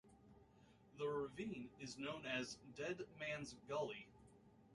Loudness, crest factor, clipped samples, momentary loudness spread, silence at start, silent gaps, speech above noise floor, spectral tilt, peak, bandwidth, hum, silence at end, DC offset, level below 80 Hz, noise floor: -48 LUFS; 18 dB; under 0.1%; 23 LU; 0.05 s; none; 22 dB; -4.5 dB/octave; -32 dBFS; 11 kHz; none; 0 s; under 0.1%; -76 dBFS; -70 dBFS